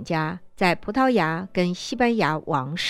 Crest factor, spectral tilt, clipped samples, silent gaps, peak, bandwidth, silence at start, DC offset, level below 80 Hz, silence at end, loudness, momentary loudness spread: 20 dB; -5.5 dB/octave; under 0.1%; none; -4 dBFS; 13 kHz; 0 s; under 0.1%; -54 dBFS; 0 s; -23 LUFS; 6 LU